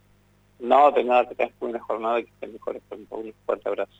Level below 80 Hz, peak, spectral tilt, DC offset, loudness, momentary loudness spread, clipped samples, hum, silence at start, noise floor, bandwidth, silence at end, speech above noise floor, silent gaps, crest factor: -66 dBFS; -6 dBFS; -5.5 dB/octave; under 0.1%; -23 LUFS; 19 LU; under 0.1%; 50 Hz at -60 dBFS; 0.6 s; -59 dBFS; 7.8 kHz; 0.15 s; 36 dB; none; 18 dB